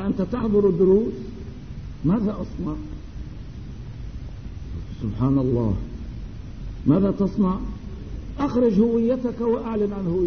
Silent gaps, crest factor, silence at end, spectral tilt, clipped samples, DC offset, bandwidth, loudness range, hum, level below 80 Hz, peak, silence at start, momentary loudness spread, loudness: none; 18 dB; 0 s; -10 dB/octave; under 0.1%; 0.6%; 6.6 kHz; 7 LU; none; -36 dBFS; -6 dBFS; 0 s; 19 LU; -22 LUFS